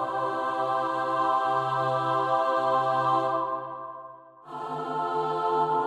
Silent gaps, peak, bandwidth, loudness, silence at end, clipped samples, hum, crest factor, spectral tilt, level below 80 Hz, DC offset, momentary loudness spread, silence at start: none; -14 dBFS; 11 kHz; -26 LUFS; 0 s; under 0.1%; none; 14 dB; -6 dB/octave; -76 dBFS; under 0.1%; 13 LU; 0 s